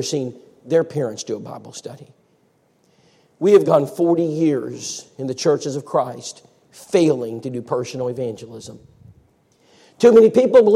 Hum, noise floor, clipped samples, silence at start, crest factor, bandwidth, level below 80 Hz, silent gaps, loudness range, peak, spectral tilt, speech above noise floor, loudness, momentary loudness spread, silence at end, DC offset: none; -61 dBFS; under 0.1%; 0 s; 18 dB; 13 kHz; -66 dBFS; none; 5 LU; -2 dBFS; -6 dB/octave; 43 dB; -18 LUFS; 22 LU; 0 s; under 0.1%